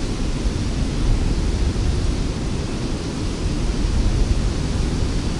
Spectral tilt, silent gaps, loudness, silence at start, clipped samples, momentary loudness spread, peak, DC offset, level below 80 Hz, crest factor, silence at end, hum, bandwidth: -6 dB/octave; none; -23 LUFS; 0 s; under 0.1%; 4 LU; -6 dBFS; under 0.1%; -22 dBFS; 14 dB; 0 s; none; 11.5 kHz